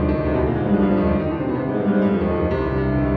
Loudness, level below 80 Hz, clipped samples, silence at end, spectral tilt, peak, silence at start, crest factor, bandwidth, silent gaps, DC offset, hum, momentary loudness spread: -20 LUFS; -30 dBFS; under 0.1%; 0 s; -11 dB/octave; -6 dBFS; 0 s; 12 dB; 4.8 kHz; none; under 0.1%; none; 4 LU